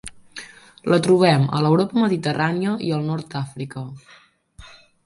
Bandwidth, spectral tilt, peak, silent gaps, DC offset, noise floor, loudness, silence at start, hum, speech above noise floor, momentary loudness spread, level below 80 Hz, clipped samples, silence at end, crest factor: 11.5 kHz; -6.5 dB/octave; -4 dBFS; none; under 0.1%; -46 dBFS; -20 LUFS; 0.05 s; none; 26 dB; 22 LU; -56 dBFS; under 0.1%; 0.35 s; 18 dB